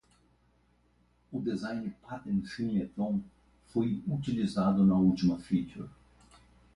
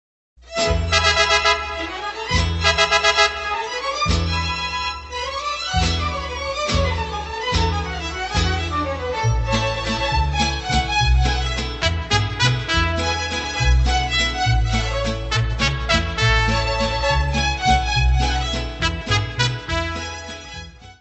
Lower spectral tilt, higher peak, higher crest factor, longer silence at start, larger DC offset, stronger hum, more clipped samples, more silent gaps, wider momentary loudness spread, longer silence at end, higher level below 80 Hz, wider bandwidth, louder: first, -8 dB/octave vs -4 dB/octave; second, -16 dBFS vs 0 dBFS; about the same, 16 dB vs 20 dB; first, 1.3 s vs 0.45 s; neither; first, 60 Hz at -55 dBFS vs none; neither; neither; first, 16 LU vs 9 LU; first, 0.85 s vs 0.1 s; second, -60 dBFS vs -26 dBFS; first, 11 kHz vs 8.4 kHz; second, -31 LUFS vs -20 LUFS